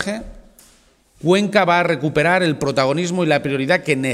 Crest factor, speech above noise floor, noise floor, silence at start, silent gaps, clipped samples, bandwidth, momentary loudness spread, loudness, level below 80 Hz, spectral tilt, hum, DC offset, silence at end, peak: 18 dB; 37 dB; -54 dBFS; 0 s; none; under 0.1%; 14 kHz; 4 LU; -17 LUFS; -48 dBFS; -5.5 dB/octave; none; under 0.1%; 0 s; 0 dBFS